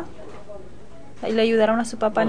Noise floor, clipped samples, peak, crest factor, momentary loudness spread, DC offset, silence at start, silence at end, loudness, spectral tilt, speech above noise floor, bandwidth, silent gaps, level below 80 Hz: -45 dBFS; under 0.1%; -6 dBFS; 16 dB; 23 LU; 2%; 0 s; 0 s; -21 LUFS; -5 dB/octave; 25 dB; 10 kHz; none; -52 dBFS